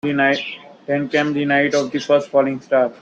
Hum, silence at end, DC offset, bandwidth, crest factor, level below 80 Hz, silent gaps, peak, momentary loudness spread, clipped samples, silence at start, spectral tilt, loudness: none; 0.05 s; under 0.1%; 8 kHz; 16 dB; -64 dBFS; none; -4 dBFS; 7 LU; under 0.1%; 0.05 s; -5 dB/octave; -18 LUFS